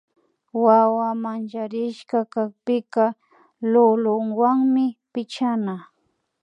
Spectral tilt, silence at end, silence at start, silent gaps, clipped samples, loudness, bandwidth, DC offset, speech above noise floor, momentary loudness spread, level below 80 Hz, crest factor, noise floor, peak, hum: -7.5 dB/octave; 0.6 s; 0.55 s; none; under 0.1%; -21 LUFS; 9.4 kHz; under 0.1%; 51 dB; 12 LU; -80 dBFS; 18 dB; -71 dBFS; -4 dBFS; none